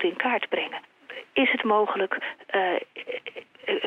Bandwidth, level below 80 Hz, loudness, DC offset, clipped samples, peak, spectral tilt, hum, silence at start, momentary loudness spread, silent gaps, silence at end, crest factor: 5.4 kHz; -76 dBFS; -26 LUFS; under 0.1%; under 0.1%; -6 dBFS; -5.5 dB/octave; none; 0 s; 15 LU; none; 0 s; 20 dB